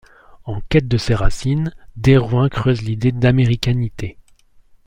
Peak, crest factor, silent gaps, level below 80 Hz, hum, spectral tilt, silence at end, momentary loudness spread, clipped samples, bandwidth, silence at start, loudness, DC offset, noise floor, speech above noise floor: 0 dBFS; 18 dB; none; -30 dBFS; none; -7 dB/octave; 0.75 s; 15 LU; under 0.1%; 10.5 kHz; 0.35 s; -17 LUFS; under 0.1%; -50 dBFS; 34 dB